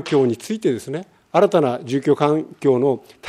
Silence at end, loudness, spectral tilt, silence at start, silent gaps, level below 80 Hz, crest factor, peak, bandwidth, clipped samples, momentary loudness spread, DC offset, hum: 0 s; -19 LUFS; -6.5 dB/octave; 0 s; none; -68 dBFS; 18 dB; -2 dBFS; 14 kHz; under 0.1%; 7 LU; under 0.1%; none